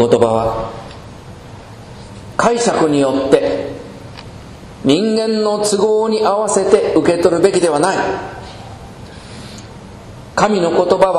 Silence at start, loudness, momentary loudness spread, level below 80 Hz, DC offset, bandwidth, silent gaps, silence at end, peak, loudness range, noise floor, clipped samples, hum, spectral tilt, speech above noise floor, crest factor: 0 s; -14 LUFS; 22 LU; -42 dBFS; under 0.1%; 12.5 kHz; none; 0 s; 0 dBFS; 5 LU; -34 dBFS; under 0.1%; none; -5 dB/octave; 21 dB; 16 dB